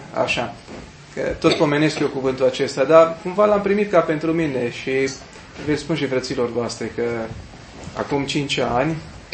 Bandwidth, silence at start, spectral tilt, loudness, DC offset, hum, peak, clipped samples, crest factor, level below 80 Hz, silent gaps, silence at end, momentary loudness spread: 8.8 kHz; 0 s; -5.5 dB/octave; -20 LUFS; under 0.1%; none; 0 dBFS; under 0.1%; 20 dB; -48 dBFS; none; 0 s; 16 LU